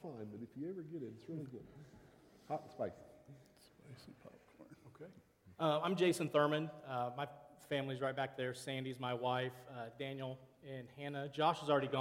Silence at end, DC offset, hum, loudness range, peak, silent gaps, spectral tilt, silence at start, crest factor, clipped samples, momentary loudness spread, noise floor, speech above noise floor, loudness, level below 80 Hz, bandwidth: 0 s; under 0.1%; none; 13 LU; -20 dBFS; none; -5.5 dB/octave; 0 s; 22 dB; under 0.1%; 24 LU; -65 dBFS; 25 dB; -40 LUFS; -78 dBFS; 16.5 kHz